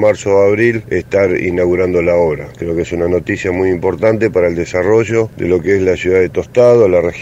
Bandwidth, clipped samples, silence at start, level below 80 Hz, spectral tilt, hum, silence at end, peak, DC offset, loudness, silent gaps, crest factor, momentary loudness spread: 8.4 kHz; under 0.1%; 0 s; -40 dBFS; -7 dB/octave; none; 0 s; 0 dBFS; under 0.1%; -13 LUFS; none; 12 dB; 7 LU